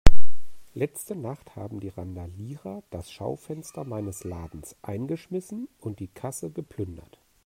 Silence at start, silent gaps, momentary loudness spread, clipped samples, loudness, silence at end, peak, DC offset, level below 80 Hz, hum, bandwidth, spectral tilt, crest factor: 0.05 s; none; 7 LU; 0.2%; -35 LUFS; 0 s; 0 dBFS; under 0.1%; -32 dBFS; none; 15.5 kHz; -6 dB/octave; 20 dB